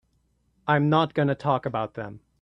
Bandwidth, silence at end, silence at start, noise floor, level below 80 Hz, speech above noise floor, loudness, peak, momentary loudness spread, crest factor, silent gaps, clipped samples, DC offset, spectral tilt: 6 kHz; 0.25 s; 0.65 s; -68 dBFS; -62 dBFS; 44 dB; -24 LUFS; -8 dBFS; 15 LU; 18 dB; none; under 0.1%; under 0.1%; -8.5 dB/octave